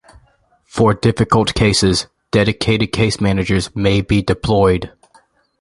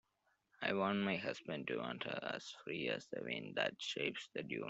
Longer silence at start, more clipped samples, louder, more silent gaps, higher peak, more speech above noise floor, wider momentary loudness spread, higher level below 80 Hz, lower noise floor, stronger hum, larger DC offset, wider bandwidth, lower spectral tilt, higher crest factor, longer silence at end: first, 0.75 s vs 0.6 s; neither; first, -16 LUFS vs -41 LUFS; neither; first, 0 dBFS vs -22 dBFS; about the same, 41 dB vs 40 dB; second, 5 LU vs 8 LU; first, -34 dBFS vs -82 dBFS; second, -56 dBFS vs -81 dBFS; neither; neither; first, 11.5 kHz vs 8.2 kHz; about the same, -5.5 dB/octave vs -4.5 dB/octave; second, 16 dB vs 22 dB; first, 0.7 s vs 0 s